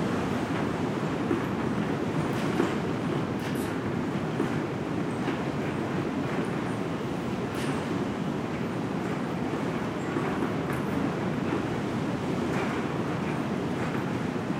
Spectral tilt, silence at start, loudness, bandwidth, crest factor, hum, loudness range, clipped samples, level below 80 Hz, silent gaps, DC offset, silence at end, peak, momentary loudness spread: -6.5 dB/octave; 0 s; -30 LUFS; 16 kHz; 18 dB; none; 2 LU; under 0.1%; -56 dBFS; none; under 0.1%; 0 s; -12 dBFS; 2 LU